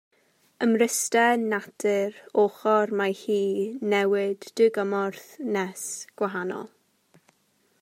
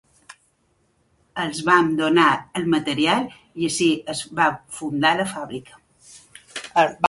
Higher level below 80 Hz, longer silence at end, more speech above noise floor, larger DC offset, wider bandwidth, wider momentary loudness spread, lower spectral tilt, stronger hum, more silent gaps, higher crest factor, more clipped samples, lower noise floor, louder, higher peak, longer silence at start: second, -84 dBFS vs -60 dBFS; first, 1.15 s vs 0 s; about the same, 43 dB vs 45 dB; neither; first, 16 kHz vs 11.5 kHz; second, 10 LU vs 16 LU; about the same, -4 dB/octave vs -4 dB/octave; neither; neither; about the same, 18 dB vs 20 dB; neither; about the same, -68 dBFS vs -65 dBFS; second, -25 LUFS vs -21 LUFS; second, -8 dBFS vs -2 dBFS; first, 0.6 s vs 0.3 s